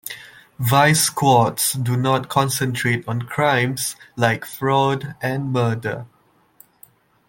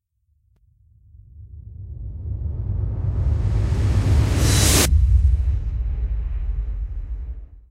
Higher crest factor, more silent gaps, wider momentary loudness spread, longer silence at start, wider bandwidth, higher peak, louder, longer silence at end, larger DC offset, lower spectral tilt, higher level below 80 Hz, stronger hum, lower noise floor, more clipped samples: about the same, 18 dB vs 18 dB; neither; second, 10 LU vs 19 LU; second, 0.05 s vs 1.35 s; about the same, 17 kHz vs 16 kHz; about the same, -2 dBFS vs -2 dBFS; about the same, -19 LUFS vs -21 LUFS; first, 1.2 s vs 0.1 s; neither; about the same, -4.5 dB/octave vs -4.5 dB/octave; second, -58 dBFS vs -24 dBFS; neither; second, -53 dBFS vs -65 dBFS; neither